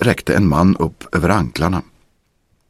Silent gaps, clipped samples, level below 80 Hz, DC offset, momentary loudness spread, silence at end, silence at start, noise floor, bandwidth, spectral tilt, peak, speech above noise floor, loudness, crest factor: none; under 0.1%; -34 dBFS; under 0.1%; 6 LU; 0.85 s; 0 s; -62 dBFS; 15 kHz; -7 dB/octave; 0 dBFS; 46 dB; -17 LUFS; 16 dB